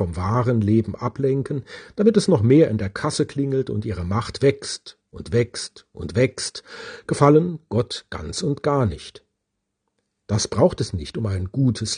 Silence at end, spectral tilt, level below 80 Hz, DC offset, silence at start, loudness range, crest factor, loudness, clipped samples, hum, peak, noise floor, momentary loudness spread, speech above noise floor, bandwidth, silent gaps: 0 s; -6 dB/octave; -48 dBFS; under 0.1%; 0 s; 5 LU; 22 dB; -22 LUFS; under 0.1%; none; 0 dBFS; -78 dBFS; 16 LU; 57 dB; 10 kHz; none